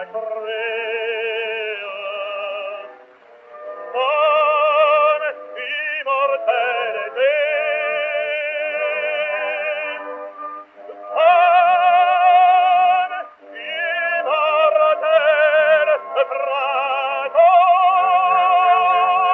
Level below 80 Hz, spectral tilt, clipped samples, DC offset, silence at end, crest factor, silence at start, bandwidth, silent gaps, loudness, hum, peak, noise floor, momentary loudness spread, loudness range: -86 dBFS; 3.5 dB/octave; under 0.1%; under 0.1%; 0 s; 14 dB; 0 s; 4.1 kHz; none; -17 LUFS; none; -2 dBFS; -46 dBFS; 14 LU; 8 LU